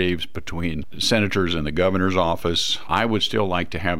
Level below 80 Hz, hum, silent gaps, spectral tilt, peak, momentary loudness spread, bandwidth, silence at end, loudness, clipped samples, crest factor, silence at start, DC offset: -42 dBFS; none; none; -4.5 dB/octave; -6 dBFS; 8 LU; 16.5 kHz; 0 s; -22 LUFS; under 0.1%; 16 dB; 0 s; 3%